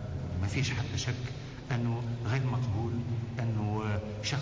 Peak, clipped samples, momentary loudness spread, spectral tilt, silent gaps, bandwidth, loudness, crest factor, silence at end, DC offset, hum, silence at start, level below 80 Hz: -22 dBFS; under 0.1%; 5 LU; -6 dB/octave; none; 8 kHz; -33 LUFS; 10 dB; 0 s; under 0.1%; none; 0 s; -46 dBFS